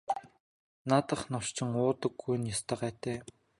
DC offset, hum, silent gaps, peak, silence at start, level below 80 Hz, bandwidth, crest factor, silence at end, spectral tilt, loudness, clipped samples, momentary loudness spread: under 0.1%; none; 0.40-0.85 s; -10 dBFS; 0.1 s; -64 dBFS; 11.5 kHz; 24 dB; 0.35 s; -5 dB/octave; -33 LUFS; under 0.1%; 9 LU